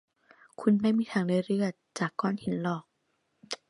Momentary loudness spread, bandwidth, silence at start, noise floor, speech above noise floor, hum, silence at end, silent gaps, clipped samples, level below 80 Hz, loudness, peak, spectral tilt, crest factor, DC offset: 8 LU; 11 kHz; 0.6 s; -76 dBFS; 48 dB; none; 0.15 s; none; under 0.1%; -72 dBFS; -29 LUFS; -12 dBFS; -6.5 dB/octave; 18 dB; under 0.1%